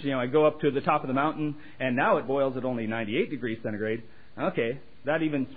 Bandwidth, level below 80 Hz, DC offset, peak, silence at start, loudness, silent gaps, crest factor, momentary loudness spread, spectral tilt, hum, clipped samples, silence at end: 4.9 kHz; -64 dBFS; 0.7%; -8 dBFS; 0 s; -28 LUFS; none; 18 dB; 9 LU; -10.5 dB/octave; none; under 0.1%; 0 s